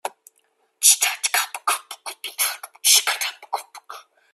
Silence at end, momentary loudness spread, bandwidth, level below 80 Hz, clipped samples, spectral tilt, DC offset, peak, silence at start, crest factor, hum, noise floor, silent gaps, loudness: 0.35 s; 19 LU; 16 kHz; -88 dBFS; under 0.1%; 5.5 dB/octave; under 0.1%; 0 dBFS; 0.05 s; 24 dB; none; -66 dBFS; none; -19 LUFS